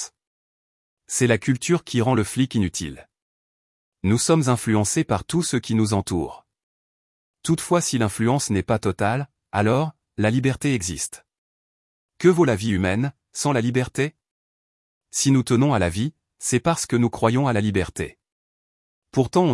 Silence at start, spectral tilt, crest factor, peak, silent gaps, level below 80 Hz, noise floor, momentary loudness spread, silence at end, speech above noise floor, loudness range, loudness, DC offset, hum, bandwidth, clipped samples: 0 s; -5.5 dB/octave; 18 dB; -4 dBFS; 0.27-0.97 s, 3.22-3.92 s, 6.63-7.34 s, 11.38-12.09 s, 14.31-15.01 s, 18.32-19.02 s; -52 dBFS; under -90 dBFS; 9 LU; 0 s; over 69 dB; 2 LU; -22 LUFS; under 0.1%; none; 12 kHz; under 0.1%